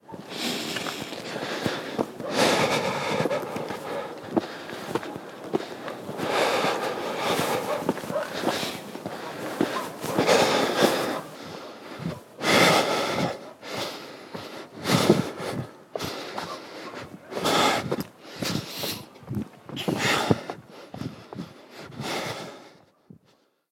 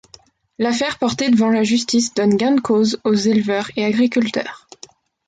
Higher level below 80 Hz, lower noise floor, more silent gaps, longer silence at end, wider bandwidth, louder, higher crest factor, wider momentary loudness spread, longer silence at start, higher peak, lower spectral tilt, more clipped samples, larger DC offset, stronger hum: second, -62 dBFS vs -56 dBFS; first, -64 dBFS vs -49 dBFS; neither; first, 1 s vs 0.7 s; first, 18.5 kHz vs 9.4 kHz; second, -27 LUFS vs -17 LUFS; first, 26 dB vs 12 dB; first, 17 LU vs 6 LU; second, 0.1 s vs 0.6 s; first, -2 dBFS vs -6 dBFS; about the same, -4 dB/octave vs -4.5 dB/octave; neither; neither; neither